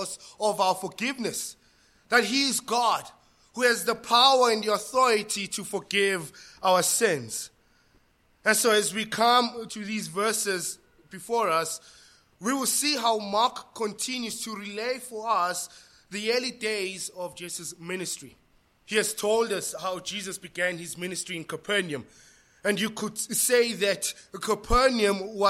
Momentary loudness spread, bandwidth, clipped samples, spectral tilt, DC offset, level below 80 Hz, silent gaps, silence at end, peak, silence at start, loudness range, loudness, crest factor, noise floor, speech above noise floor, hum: 13 LU; 16.5 kHz; under 0.1%; -2 dB/octave; under 0.1%; -50 dBFS; none; 0 s; -4 dBFS; 0 s; 7 LU; -26 LUFS; 22 dB; -64 dBFS; 37 dB; none